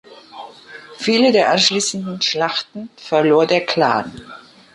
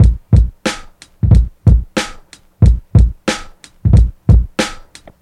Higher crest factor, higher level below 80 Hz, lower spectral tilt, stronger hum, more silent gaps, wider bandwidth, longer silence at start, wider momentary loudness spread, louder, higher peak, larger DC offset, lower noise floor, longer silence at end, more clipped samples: about the same, 16 dB vs 12 dB; second, -60 dBFS vs -16 dBFS; second, -3.5 dB/octave vs -6.5 dB/octave; neither; neither; about the same, 11.5 kHz vs 11.5 kHz; about the same, 0.1 s vs 0 s; first, 23 LU vs 10 LU; about the same, -16 LUFS vs -14 LUFS; about the same, -2 dBFS vs 0 dBFS; neither; about the same, -39 dBFS vs -39 dBFS; about the same, 0.35 s vs 0.45 s; second, under 0.1% vs 0.2%